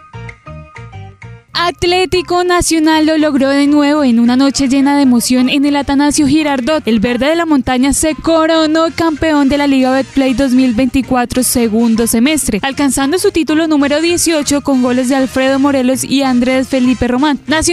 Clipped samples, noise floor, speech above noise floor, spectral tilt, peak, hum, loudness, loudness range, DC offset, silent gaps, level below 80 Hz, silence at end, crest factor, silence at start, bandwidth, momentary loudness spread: under 0.1%; -33 dBFS; 22 dB; -3.5 dB/octave; -2 dBFS; none; -11 LUFS; 2 LU; under 0.1%; none; -34 dBFS; 0 s; 10 dB; 0.15 s; 15 kHz; 4 LU